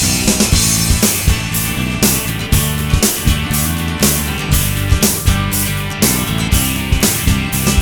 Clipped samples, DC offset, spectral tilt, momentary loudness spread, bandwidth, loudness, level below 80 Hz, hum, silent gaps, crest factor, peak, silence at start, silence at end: under 0.1%; under 0.1%; -3.5 dB/octave; 4 LU; over 20 kHz; -14 LUFS; -22 dBFS; none; none; 14 dB; 0 dBFS; 0 s; 0 s